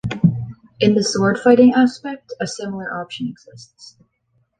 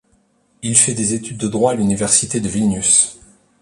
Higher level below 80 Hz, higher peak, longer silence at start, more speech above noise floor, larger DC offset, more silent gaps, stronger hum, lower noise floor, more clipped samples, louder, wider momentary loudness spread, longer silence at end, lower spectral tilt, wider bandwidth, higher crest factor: about the same, -50 dBFS vs -48 dBFS; about the same, -2 dBFS vs 0 dBFS; second, 0.05 s vs 0.65 s; first, 48 dB vs 43 dB; neither; neither; neither; first, -65 dBFS vs -59 dBFS; neither; about the same, -17 LUFS vs -15 LUFS; first, 18 LU vs 9 LU; first, 0.7 s vs 0.45 s; first, -6 dB/octave vs -3.5 dB/octave; second, 9.4 kHz vs 11.5 kHz; about the same, 16 dB vs 18 dB